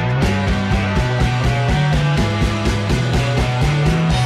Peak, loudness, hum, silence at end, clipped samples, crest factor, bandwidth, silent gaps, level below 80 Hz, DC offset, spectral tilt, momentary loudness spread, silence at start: -6 dBFS; -17 LUFS; none; 0 s; under 0.1%; 10 dB; 13.5 kHz; none; -24 dBFS; under 0.1%; -6 dB/octave; 2 LU; 0 s